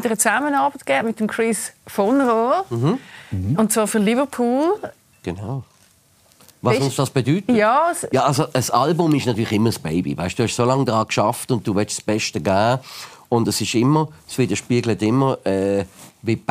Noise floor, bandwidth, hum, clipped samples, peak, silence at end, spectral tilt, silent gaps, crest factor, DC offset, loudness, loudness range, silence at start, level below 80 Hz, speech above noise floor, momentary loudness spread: -55 dBFS; 15.5 kHz; none; under 0.1%; -2 dBFS; 0.1 s; -5 dB/octave; none; 18 dB; under 0.1%; -20 LUFS; 3 LU; 0 s; -56 dBFS; 36 dB; 10 LU